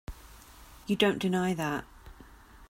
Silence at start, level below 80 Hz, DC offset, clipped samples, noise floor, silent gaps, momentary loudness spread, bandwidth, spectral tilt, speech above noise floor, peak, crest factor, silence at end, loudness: 0.1 s; -52 dBFS; under 0.1%; under 0.1%; -53 dBFS; none; 25 LU; 16 kHz; -5.5 dB/octave; 24 dB; -10 dBFS; 22 dB; 0.05 s; -29 LUFS